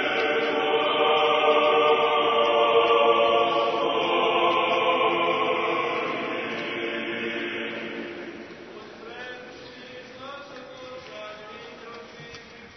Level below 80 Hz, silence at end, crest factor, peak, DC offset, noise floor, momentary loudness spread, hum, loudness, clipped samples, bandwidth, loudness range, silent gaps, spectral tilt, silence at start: -68 dBFS; 0 s; 16 dB; -8 dBFS; under 0.1%; -44 dBFS; 21 LU; none; -22 LUFS; under 0.1%; 6.4 kHz; 19 LU; none; -4 dB/octave; 0 s